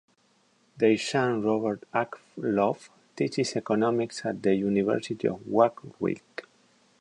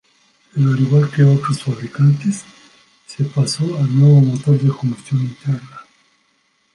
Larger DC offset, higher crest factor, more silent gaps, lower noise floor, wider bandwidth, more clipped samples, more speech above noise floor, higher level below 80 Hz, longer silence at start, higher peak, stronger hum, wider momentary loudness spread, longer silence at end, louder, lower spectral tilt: neither; first, 20 dB vs 14 dB; neither; first, -66 dBFS vs -62 dBFS; about the same, 11 kHz vs 11 kHz; neither; second, 40 dB vs 47 dB; second, -68 dBFS vs -60 dBFS; first, 0.75 s vs 0.55 s; second, -8 dBFS vs -2 dBFS; neither; second, 9 LU vs 12 LU; second, 0.6 s vs 0.9 s; second, -27 LUFS vs -16 LUFS; second, -6 dB/octave vs -7.5 dB/octave